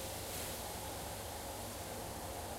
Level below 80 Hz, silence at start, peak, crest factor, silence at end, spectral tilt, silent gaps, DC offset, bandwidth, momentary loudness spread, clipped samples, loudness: -56 dBFS; 0 s; -32 dBFS; 12 dB; 0 s; -3 dB/octave; none; under 0.1%; 16 kHz; 3 LU; under 0.1%; -43 LUFS